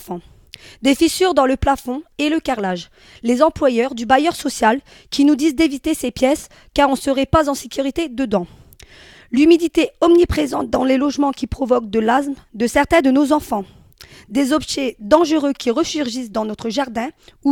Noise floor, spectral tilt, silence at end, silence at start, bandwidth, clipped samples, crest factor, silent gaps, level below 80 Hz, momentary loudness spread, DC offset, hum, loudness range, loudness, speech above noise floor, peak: -44 dBFS; -4.5 dB/octave; 0 s; 0 s; 17.5 kHz; under 0.1%; 18 dB; none; -40 dBFS; 10 LU; under 0.1%; none; 3 LU; -17 LUFS; 27 dB; 0 dBFS